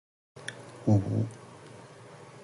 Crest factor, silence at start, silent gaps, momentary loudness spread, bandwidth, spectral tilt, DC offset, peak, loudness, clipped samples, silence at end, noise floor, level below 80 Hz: 22 dB; 0.35 s; none; 23 LU; 11.5 kHz; -7.5 dB/octave; under 0.1%; -12 dBFS; -30 LUFS; under 0.1%; 0 s; -49 dBFS; -56 dBFS